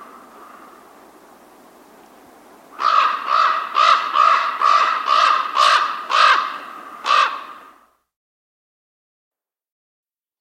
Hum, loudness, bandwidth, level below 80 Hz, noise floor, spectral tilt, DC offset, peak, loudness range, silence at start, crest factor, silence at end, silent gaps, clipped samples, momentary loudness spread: none; -16 LUFS; 15.5 kHz; -74 dBFS; -52 dBFS; 1 dB/octave; under 0.1%; 0 dBFS; 10 LU; 0 s; 20 dB; 2.8 s; none; under 0.1%; 13 LU